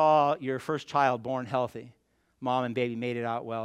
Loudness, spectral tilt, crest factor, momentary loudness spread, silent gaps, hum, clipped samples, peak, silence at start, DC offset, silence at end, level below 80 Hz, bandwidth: -29 LUFS; -6.5 dB/octave; 18 dB; 8 LU; none; none; under 0.1%; -10 dBFS; 0 s; under 0.1%; 0 s; -74 dBFS; 13 kHz